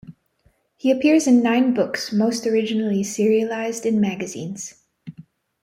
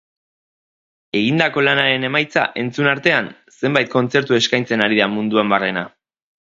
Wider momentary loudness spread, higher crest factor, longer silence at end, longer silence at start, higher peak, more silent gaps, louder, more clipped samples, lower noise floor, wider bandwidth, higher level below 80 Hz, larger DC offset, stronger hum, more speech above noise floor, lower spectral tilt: first, 15 LU vs 7 LU; about the same, 16 dB vs 18 dB; second, 0.4 s vs 0.6 s; second, 0.1 s vs 1.15 s; second, -6 dBFS vs 0 dBFS; neither; second, -20 LUFS vs -17 LUFS; neither; second, -63 dBFS vs under -90 dBFS; first, 15 kHz vs 7.8 kHz; about the same, -64 dBFS vs -62 dBFS; neither; neither; second, 43 dB vs over 73 dB; about the same, -5 dB/octave vs -5 dB/octave